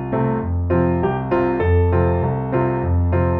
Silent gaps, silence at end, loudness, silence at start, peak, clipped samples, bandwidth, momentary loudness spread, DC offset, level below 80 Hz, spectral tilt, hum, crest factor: none; 0 s; -19 LUFS; 0 s; -4 dBFS; under 0.1%; 3.8 kHz; 4 LU; under 0.1%; -32 dBFS; -12 dB/octave; none; 14 dB